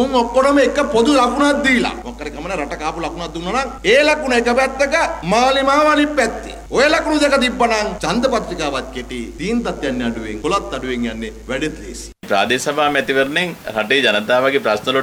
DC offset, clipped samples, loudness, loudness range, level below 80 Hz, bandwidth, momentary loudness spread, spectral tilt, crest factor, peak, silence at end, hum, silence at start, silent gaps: under 0.1%; under 0.1%; -16 LUFS; 6 LU; -38 dBFS; 17.5 kHz; 12 LU; -3.5 dB/octave; 14 dB; -2 dBFS; 0 s; none; 0 s; none